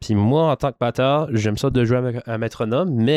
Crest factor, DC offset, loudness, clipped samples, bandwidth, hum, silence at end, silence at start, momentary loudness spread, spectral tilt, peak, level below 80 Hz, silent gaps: 12 dB; under 0.1%; -20 LUFS; under 0.1%; 13.5 kHz; none; 0 s; 0 s; 7 LU; -7 dB/octave; -6 dBFS; -44 dBFS; none